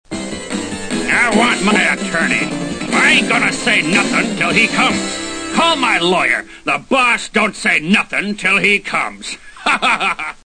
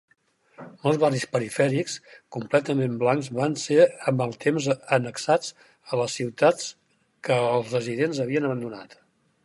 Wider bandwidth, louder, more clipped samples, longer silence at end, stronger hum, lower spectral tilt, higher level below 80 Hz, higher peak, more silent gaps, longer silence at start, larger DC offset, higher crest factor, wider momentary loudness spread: second, 9.8 kHz vs 11.5 kHz; first, -14 LUFS vs -24 LUFS; neither; second, 0.15 s vs 0.6 s; neither; second, -3 dB/octave vs -5.5 dB/octave; first, -44 dBFS vs -72 dBFS; first, 0 dBFS vs -6 dBFS; neither; second, 0.1 s vs 0.6 s; neither; about the same, 16 dB vs 18 dB; about the same, 11 LU vs 11 LU